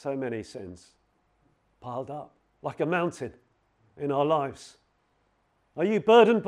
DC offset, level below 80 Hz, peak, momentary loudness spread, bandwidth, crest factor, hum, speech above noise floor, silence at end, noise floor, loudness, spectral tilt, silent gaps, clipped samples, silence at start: under 0.1%; -70 dBFS; -6 dBFS; 23 LU; 10.5 kHz; 22 dB; none; 44 dB; 0 s; -70 dBFS; -27 LUFS; -6 dB/octave; none; under 0.1%; 0.05 s